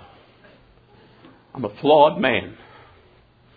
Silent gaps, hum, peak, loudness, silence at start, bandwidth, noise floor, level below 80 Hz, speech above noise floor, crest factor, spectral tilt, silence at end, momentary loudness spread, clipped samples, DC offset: none; none; -2 dBFS; -19 LUFS; 1.55 s; 4.9 kHz; -54 dBFS; -58 dBFS; 36 dB; 22 dB; -9 dB/octave; 1.05 s; 23 LU; under 0.1%; under 0.1%